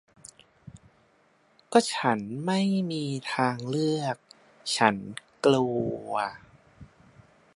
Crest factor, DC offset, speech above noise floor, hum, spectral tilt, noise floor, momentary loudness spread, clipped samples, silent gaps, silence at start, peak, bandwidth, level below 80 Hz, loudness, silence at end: 26 dB; under 0.1%; 38 dB; none; -5 dB/octave; -64 dBFS; 10 LU; under 0.1%; none; 0.75 s; -4 dBFS; 11.5 kHz; -66 dBFS; -27 LUFS; 0.7 s